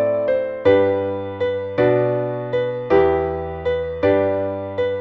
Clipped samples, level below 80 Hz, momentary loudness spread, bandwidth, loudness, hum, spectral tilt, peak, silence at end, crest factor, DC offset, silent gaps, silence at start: under 0.1%; -44 dBFS; 7 LU; 5.4 kHz; -20 LUFS; none; -9 dB/octave; -4 dBFS; 0 s; 16 dB; under 0.1%; none; 0 s